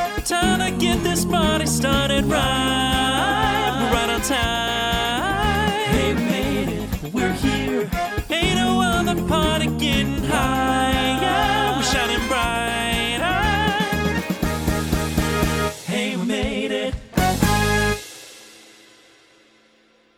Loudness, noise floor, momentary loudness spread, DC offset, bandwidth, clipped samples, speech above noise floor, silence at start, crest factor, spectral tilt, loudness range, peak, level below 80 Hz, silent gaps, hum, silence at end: -20 LUFS; -57 dBFS; 5 LU; under 0.1%; over 20 kHz; under 0.1%; 38 dB; 0 s; 18 dB; -4 dB/octave; 3 LU; -2 dBFS; -32 dBFS; none; none; 1.65 s